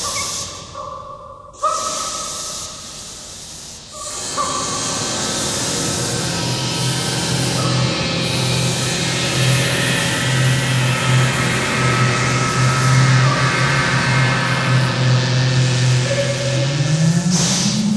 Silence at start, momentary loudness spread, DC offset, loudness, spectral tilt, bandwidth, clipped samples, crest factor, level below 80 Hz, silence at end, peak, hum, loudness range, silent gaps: 0 s; 14 LU; under 0.1%; -17 LUFS; -4 dB/octave; 11 kHz; under 0.1%; 16 dB; -42 dBFS; 0 s; -2 dBFS; none; 8 LU; none